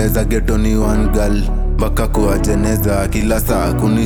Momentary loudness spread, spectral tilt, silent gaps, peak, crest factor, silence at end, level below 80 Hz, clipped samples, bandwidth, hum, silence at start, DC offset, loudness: 3 LU; -6.5 dB/octave; none; -4 dBFS; 10 dB; 0 s; -18 dBFS; under 0.1%; 19.5 kHz; none; 0 s; under 0.1%; -16 LUFS